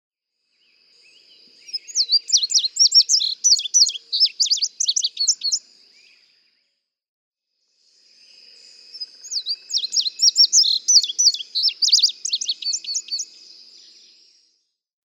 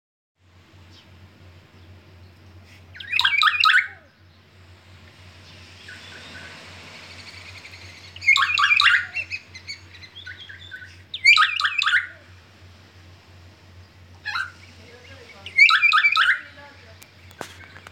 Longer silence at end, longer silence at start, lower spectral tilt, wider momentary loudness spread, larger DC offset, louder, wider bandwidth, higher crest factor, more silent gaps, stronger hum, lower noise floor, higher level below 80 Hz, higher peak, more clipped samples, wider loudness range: first, 1.85 s vs 0.25 s; second, 1.7 s vs 2.95 s; second, 7.5 dB/octave vs 0 dB/octave; second, 14 LU vs 26 LU; neither; about the same, -16 LUFS vs -17 LUFS; about the same, 18 kHz vs 17 kHz; about the same, 20 dB vs 22 dB; first, 7.08-7.32 s vs none; neither; first, -73 dBFS vs -53 dBFS; second, under -90 dBFS vs -62 dBFS; about the same, -2 dBFS vs -4 dBFS; neither; second, 11 LU vs 17 LU